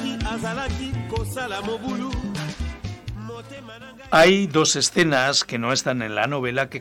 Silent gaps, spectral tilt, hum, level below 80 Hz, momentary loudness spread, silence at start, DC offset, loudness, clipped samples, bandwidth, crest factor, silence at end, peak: none; -3.5 dB/octave; none; -38 dBFS; 19 LU; 0 s; under 0.1%; -22 LUFS; under 0.1%; 17 kHz; 16 dB; 0 s; -6 dBFS